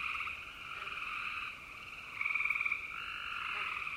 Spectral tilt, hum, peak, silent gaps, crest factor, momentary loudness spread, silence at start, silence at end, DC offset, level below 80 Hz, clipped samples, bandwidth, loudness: -1.5 dB/octave; none; -20 dBFS; none; 18 dB; 12 LU; 0 s; 0 s; under 0.1%; -66 dBFS; under 0.1%; 16 kHz; -37 LUFS